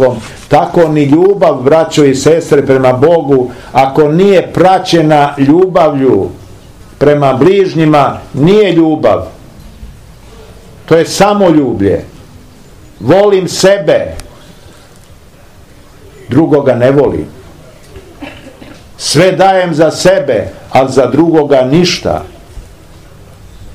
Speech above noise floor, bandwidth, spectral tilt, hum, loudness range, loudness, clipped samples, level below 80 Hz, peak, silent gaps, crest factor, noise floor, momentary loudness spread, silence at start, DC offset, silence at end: 30 dB; 15.5 kHz; -6 dB/octave; none; 5 LU; -8 LUFS; 4%; -38 dBFS; 0 dBFS; none; 10 dB; -37 dBFS; 8 LU; 0 s; 0.7%; 0 s